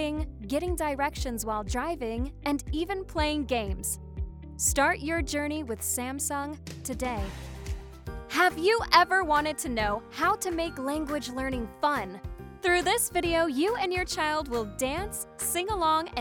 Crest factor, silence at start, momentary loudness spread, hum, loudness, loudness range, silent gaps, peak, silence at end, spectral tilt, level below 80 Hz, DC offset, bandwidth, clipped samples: 24 dB; 0 s; 13 LU; none; -28 LUFS; 5 LU; none; -4 dBFS; 0 s; -3.5 dB/octave; -42 dBFS; under 0.1%; over 20 kHz; under 0.1%